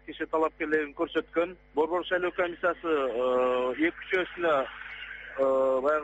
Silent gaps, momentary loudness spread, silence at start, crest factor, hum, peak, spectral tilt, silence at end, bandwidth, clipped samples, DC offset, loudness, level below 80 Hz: none; 6 LU; 0.05 s; 14 dB; none; -14 dBFS; -2 dB/octave; 0 s; 8 kHz; under 0.1%; under 0.1%; -28 LUFS; -60 dBFS